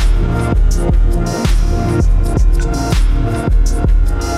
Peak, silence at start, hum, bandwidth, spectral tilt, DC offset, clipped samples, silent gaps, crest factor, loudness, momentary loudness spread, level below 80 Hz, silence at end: -2 dBFS; 0 s; none; 12 kHz; -6.5 dB/octave; under 0.1%; under 0.1%; none; 10 dB; -15 LUFS; 1 LU; -12 dBFS; 0 s